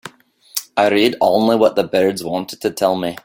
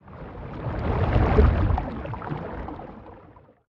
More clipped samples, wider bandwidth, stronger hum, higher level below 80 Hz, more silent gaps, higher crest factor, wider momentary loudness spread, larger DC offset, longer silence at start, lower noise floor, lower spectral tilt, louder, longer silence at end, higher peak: neither; first, 17 kHz vs 5.6 kHz; neither; second, -56 dBFS vs -28 dBFS; neither; second, 16 dB vs 22 dB; second, 10 LU vs 21 LU; neither; about the same, 0.05 s vs 0.05 s; second, -44 dBFS vs -51 dBFS; second, -4.5 dB/octave vs -10 dB/octave; first, -17 LUFS vs -25 LUFS; second, 0.1 s vs 0.4 s; about the same, 0 dBFS vs -2 dBFS